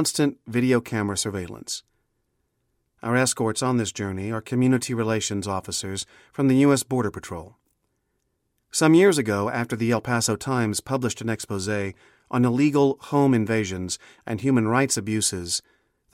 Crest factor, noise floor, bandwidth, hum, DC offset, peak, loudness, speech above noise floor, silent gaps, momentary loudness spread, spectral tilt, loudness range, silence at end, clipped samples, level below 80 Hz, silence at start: 18 dB; -74 dBFS; 16.5 kHz; none; under 0.1%; -6 dBFS; -23 LUFS; 51 dB; none; 13 LU; -5 dB/octave; 4 LU; 0.55 s; under 0.1%; -58 dBFS; 0 s